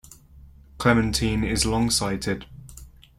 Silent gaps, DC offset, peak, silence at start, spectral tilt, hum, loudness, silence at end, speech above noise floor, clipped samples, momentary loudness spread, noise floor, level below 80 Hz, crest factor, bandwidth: none; under 0.1%; -6 dBFS; 0.35 s; -4 dB/octave; none; -23 LUFS; 0.3 s; 26 dB; under 0.1%; 12 LU; -49 dBFS; -38 dBFS; 20 dB; 16.5 kHz